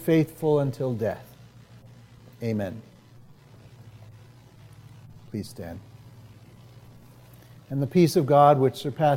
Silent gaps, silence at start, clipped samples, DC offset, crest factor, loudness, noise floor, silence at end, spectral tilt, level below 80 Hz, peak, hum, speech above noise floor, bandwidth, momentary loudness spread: none; 0 s; under 0.1%; under 0.1%; 22 dB; -24 LUFS; -51 dBFS; 0 s; -7.5 dB/octave; -62 dBFS; -6 dBFS; none; 28 dB; 16.5 kHz; 22 LU